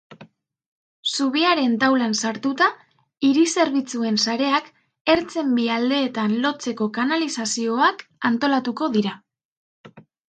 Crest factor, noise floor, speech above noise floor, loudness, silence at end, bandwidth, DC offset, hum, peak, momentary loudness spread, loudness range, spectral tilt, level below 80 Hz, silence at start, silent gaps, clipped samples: 18 dB; -49 dBFS; 29 dB; -21 LUFS; 0.3 s; 9.4 kHz; under 0.1%; none; -4 dBFS; 6 LU; 2 LU; -3.5 dB/octave; -64 dBFS; 0.1 s; 0.66-1.03 s, 5.01-5.05 s, 9.45-9.84 s; under 0.1%